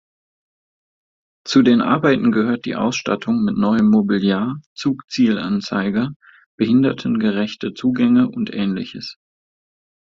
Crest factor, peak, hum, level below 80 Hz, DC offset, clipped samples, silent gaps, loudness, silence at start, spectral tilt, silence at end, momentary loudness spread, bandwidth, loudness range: 18 dB; -2 dBFS; none; -56 dBFS; under 0.1%; under 0.1%; 4.66-4.76 s, 6.16-6.20 s, 6.46-6.58 s; -18 LUFS; 1.45 s; -6.5 dB/octave; 1.05 s; 9 LU; 7.6 kHz; 3 LU